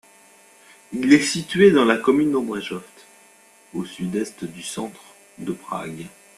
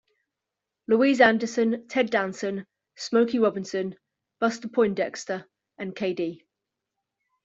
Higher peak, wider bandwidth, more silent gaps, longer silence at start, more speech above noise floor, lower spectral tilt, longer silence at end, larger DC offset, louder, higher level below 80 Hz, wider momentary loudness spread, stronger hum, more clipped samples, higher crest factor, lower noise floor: about the same, -2 dBFS vs -4 dBFS; first, 13 kHz vs 7.8 kHz; neither; about the same, 0.9 s vs 0.9 s; second, 32 dB vs 62 dB; about the same, -5 dB/octave vs -5 dB/octave; second, 0.3 s vs 1.1 s; neither; first, -21 LUFS vs -25 LUFS; first, -62 dBFS vs -70 dBFS; first, 19 LU vs 16 LU; neither; neither; about the same, 22 dB vs 22 dB; second, -52 dBFS vs -86 dBFS